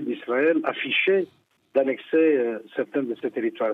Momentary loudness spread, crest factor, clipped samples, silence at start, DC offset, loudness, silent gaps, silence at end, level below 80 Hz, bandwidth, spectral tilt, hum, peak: 8 LU; 16 dB; under 0.1%; 0 s; under 0.1%; -24 LUFS; none; 0 s; -80 dBFS; 4.2 kHz; -7 dB/octave; none; -8 dBFS